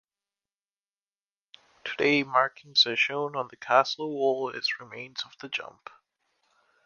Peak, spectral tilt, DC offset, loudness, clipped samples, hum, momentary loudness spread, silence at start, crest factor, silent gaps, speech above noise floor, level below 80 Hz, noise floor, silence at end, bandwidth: -6 dBFS; -3.5 dB/octave; under 0.1%; -26 LUFS; under 0.1%; none; 14 LU; 1.85 s; 24 dB; none; over 62 dB; -78 dBFS; under -90 dBFS; 1.15 s; 7.2 kHz